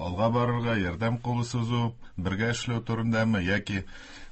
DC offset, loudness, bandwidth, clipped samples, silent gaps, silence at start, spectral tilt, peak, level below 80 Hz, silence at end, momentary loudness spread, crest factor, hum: under 0.1%; -28 LUFS; 8.6 kHz; under 0.1%; none; 0 s; -6 dB/octave; -12 dBFS; -46 dBFS; 0 s; 8 LU; 16 dB; none